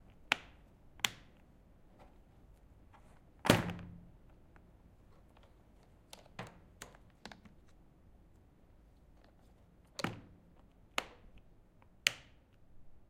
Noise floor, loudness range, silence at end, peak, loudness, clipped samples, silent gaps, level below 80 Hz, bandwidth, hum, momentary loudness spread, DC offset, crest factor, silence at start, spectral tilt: -64 dBFS; 17 LU; 0.1 s; -6 dBFS; -37 LUFS; under 0.1%; none; -62 dBFS; 16 kHz; none; 30 LU; under 0.1%; 38 dB; 0.2 s; -3.5 dB/octave